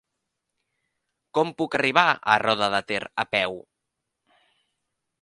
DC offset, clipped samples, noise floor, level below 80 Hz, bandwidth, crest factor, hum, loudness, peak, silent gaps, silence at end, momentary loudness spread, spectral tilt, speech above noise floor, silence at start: under 0.1%; under 0.1%; -82 dBFS; -66 dBFS; 11.5 kHz; 24 dB; none; -23 LUFS; -2 dBFS; none; 1.6 s; 10 LU; -4 dB/octave; 59 dB; 1.35 s